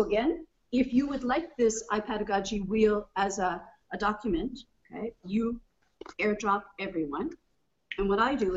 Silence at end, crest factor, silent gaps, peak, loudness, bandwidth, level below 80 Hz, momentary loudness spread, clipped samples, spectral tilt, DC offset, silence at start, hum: 0 s; 18 dB; none; -12 dBFS; -30 LUFS; 8 kHz; -50 dBFS; 13 LU; under 0.1%; -5 dB/octave; under 0.1%; 0 s; none